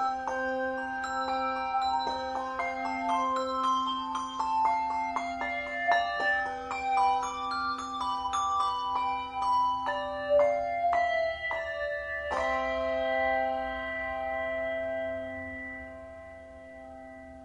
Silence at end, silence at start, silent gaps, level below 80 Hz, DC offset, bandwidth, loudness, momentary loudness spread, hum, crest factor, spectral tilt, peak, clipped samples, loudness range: 0 s; 0 s; none; -56 dBFS; under 0.1%; 10.5 kHz; -30 LUFS; 11 LU; none; 18 dB; -3.5 dB/octave; -12 dBFS; under 0.1%; 3 LU